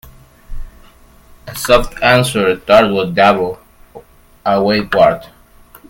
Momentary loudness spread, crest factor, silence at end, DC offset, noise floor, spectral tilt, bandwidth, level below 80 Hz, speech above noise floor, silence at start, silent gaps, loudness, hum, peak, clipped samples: 13 LU; 16 dB; 0.65 s; under 0.1%; -43 dBFS; -5 dB/octave; 17 kHz; -34 dBFS; 31 dB; 0.5 s; none; -13 LUFS; none; 0 dBFS; under 0.1%